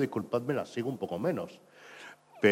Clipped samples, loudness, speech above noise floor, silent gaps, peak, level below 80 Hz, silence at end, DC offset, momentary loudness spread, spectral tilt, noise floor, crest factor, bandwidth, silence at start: under 0.1%; -33 LUFS; 18 dB; none; -10 dBFS; -74 dBFS; 0 s; under 0.1%; 18 LU; -6.5 dB/octave; -51 dBFS; 22 dB; 16 kHz; 0 s